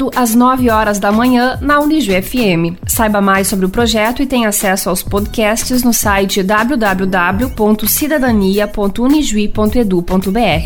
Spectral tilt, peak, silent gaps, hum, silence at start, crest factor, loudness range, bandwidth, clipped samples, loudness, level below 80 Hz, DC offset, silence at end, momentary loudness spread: -4.5 dB/octave; 0 dBFS; none; none; 0 s; 12 dB; 1 LU; 18 kHz; under 0.1%; -12 LUFS; -28 dBFS; under 0.1%; 0 s; 4 LU